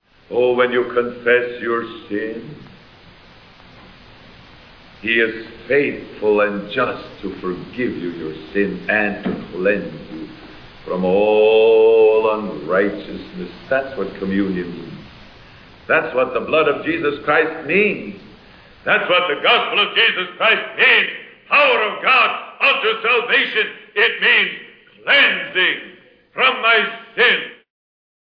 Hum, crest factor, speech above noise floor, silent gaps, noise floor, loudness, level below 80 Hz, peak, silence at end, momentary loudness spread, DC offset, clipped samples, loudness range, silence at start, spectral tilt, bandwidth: none; 16 dB; 28 dB; none; -45 dBFS; -16 LUFS; -52 dBFS; -2 dBFS; 0.8 s; 17 LU; under 0.1%; under 0.1%; 9 LU; 0.3 s; -6.5 dB/octave; 5.4 kHz